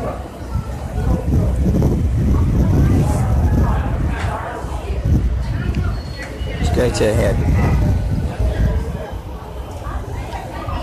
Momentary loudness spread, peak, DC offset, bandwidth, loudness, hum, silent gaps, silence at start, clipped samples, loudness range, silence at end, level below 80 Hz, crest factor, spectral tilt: 11 LU; -4 dBFS; under 0.1%; 13.5 kHz; -19 LUFS; none; none; 0 s; under 0.1%; 4 LU; 0 s; -22 dBFS; 12 dB; -7.5 dB/octave